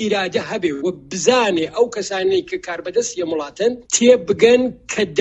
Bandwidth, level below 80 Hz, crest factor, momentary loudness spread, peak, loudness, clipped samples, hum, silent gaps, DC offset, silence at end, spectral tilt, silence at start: 8.4 kHz; -54 dBFS; 18 dB; 10 LU; 0 dBFS; -18 LUFS; under 0.1%; none; none; under 0.1%; 0 s; -3 dB/octave; 0 s